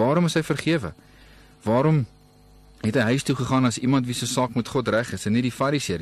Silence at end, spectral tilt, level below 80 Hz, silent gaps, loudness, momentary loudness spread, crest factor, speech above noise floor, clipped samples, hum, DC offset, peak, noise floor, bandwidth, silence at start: 0 s; -5.5 dB/octave; -52 dBFS; none; -23 LUFS; 5 LU; 14 dB; 30 dB; under 0.1%; none; under 0.1%; -10 dBFS; -52 dBFS; 13 kHz; 0 s